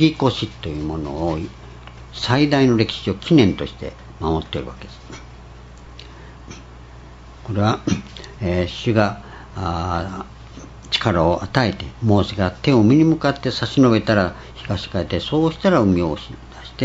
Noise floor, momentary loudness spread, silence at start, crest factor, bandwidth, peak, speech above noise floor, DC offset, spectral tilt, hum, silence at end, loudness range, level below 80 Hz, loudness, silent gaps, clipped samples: -40 dBFS; 23 LU; 0 s; 20 dB; 8 kHz; 0 dBFS; 21 dB; under 0.1%; -6.5 dB/octave; none; 0 s; 11 LU; -40 dBFS; -19 LUFS; none; under 0.1%